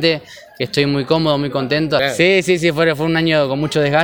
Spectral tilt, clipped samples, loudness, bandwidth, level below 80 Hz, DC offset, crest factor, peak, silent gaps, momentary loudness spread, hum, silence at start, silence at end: -5.5 dB/octave; under 0.1%; -16 LUFS; 19 kHz; -48 dBFS; under 0.1%; 16 dB; 0 dBFS; none; 5 LU; none; 0 s; 0 s